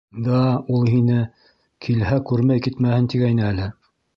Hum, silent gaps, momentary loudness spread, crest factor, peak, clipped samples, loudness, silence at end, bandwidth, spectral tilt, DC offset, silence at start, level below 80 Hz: none; none; 8 LU; 14 dB; -6 dBFS; under 0.1%; -20 LUFS; 0.45 s; 6 kHz; -9.5 dB/octave; under 0.1%; 0.15 s; -44 dBFS